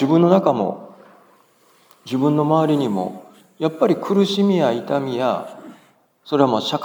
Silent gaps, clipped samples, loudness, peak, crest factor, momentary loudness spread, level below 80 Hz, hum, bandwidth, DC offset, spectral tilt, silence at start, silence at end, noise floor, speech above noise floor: none; under 0.1%; -19 LUFS; -2 dBFS; 18 dB; 11 LU; -78 dBFS; none; over 20 kHz; under 0.1%; -7 dB/octave; 0 s; 0 s; -56 dBFS; 38 dB